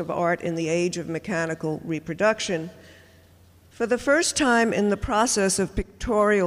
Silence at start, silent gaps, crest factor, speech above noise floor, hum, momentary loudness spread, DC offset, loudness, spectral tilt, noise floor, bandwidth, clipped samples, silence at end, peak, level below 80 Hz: 0 s; none; 16 dB; 30 dB; none; 10 LU; under 0.1%; -24 LUFS; -4 dB/octave; -54 dBFS; 15.5 kHz; under 0.1%; 0 s; -8 dBFS; -44 dBFS